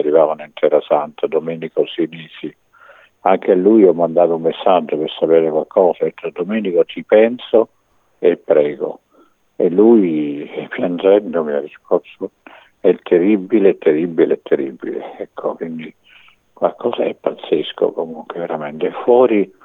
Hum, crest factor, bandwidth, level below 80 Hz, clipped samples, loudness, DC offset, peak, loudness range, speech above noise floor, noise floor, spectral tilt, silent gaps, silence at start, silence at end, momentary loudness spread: none; 16 dB; 4 kHz; -68 dBFS; under 0.1%; -16 LUFS; under 0.1%; 0 dBFS; 7 LU; 38 dB; -54 dBFS; -9 dB/octave; none; 0 s; 0.2 s; 14 LU